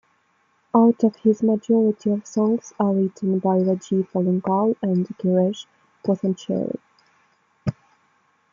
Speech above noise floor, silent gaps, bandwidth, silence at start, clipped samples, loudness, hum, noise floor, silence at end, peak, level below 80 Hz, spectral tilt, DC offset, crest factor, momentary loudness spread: 44 dB; none; 7.4 kHz; 0.75 s; under 0.1%; -22 LUFS; none; -65 dBFS; 0.8 s; -4 dBFS; -64 dBFS; -8.5 dB/octave; under 0.1%; 18 dB; 12 LU